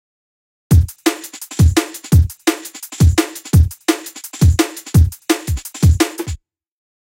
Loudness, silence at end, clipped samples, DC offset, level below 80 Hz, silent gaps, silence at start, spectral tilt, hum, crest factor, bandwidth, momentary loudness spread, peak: -16 LUFS; 0.7 s; under 0.1%; under 0.1%; -22 dBFS; none; 0.7 s; -5.5 dB/octave; none; 16 dB; 17 kHz; 13 LU; 0 dBFS